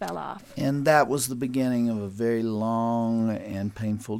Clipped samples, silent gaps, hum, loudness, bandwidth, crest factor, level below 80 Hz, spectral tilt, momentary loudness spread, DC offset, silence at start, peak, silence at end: under 0.1%; none; none; -26 LUFS; 16.5 kHz; 20 dB; -60 dBFS; -6 dB/octave; 11 LU; under 0.1%; 0 s; -6 dBFS; 0 s